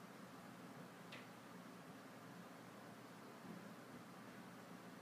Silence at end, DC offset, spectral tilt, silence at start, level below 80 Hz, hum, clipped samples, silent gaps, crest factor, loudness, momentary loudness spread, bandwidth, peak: 0 s; under 0.1%; -5 dB/octave; 0 s; under -90 dBFS; none; under 0.1%; none; 16 dB; -57 LUFS; 2 LU; 15.5 kHz; -42 dBFS